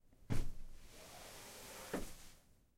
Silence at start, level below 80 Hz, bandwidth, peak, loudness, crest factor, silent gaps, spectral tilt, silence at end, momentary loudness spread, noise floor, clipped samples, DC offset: 0.1 s; -48 dBFS; 16 kHz; -24 dBFS; -50 LUFS; 20 dB; none; -4.5 dB/octave; 0.4 s; 15 LU; -64 dBFS; under 0.1%; under 0.1%